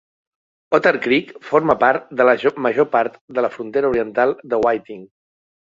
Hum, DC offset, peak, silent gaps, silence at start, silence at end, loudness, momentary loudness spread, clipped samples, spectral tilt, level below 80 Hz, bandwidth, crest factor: none; under 0.1%; -2 dBFS; 3.21-3.28 s; 0.7 s; 0.6 s; -18 LUFS; 7 LU; under 0.1%; -6.5 dB/octave; -56 dBFS; 7.6 kHz; 18 dB